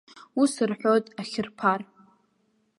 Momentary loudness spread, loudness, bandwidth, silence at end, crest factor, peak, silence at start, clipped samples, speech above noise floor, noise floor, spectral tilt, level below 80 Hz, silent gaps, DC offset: 10 LU; -26 LUFS; 11.5 kHz; 0.95 s; 20 dB; -6 dBFS; 0.15 s; under 0.1%; 45 dB; -70 dBFS; -5 dB/octave; -72 dBFS; none; under 0.1%